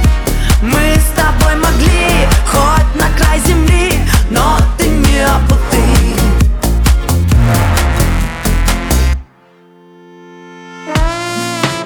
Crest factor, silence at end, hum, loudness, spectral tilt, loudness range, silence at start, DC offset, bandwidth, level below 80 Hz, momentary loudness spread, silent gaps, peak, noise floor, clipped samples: 10 dB; 0 s; none; -12 LUFS; -5 dB/octave; 6 LU; 0 s; under 0.1%; 20 kHz; -12 dBFS; 5 LU; none; 0 dBFS; -44 dBFS; under 0.1%